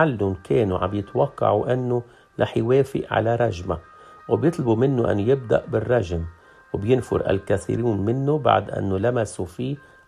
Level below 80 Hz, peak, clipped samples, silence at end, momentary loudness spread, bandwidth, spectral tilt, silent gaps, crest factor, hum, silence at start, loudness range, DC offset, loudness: -50 dBFS; -2 dBFS; under 0.1%; 0.3 s; 9 LU; 12.5 kHz; -7.5 dB/octave; none; 20 dB; none; 0 s; 1 LU; under 0.1%; -23 LUFS